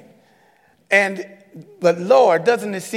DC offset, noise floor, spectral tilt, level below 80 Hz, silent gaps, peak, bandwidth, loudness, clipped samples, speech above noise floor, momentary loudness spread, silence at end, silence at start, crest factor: under 0.1%; -57 dBFS; -4.5 dB/octave; -78 dBFS; none; -2 dBFS; 15 kHz; -17 LUFS; under 0.1%; 39 dB; 12 LU; 0 s; 0.9 s; 18 dB